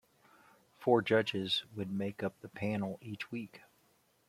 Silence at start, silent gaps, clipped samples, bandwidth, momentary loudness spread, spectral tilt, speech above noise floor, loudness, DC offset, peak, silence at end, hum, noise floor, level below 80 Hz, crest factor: 0.8 s; none; under 0.1%; 15.5 kHz; 13 LU; -6 dB/octave; 37 dB; -35 LUFS; under 0.1%; -14 dBFS; 0.7 s; none; -71 dBFS; -76 dBFS; 22 dB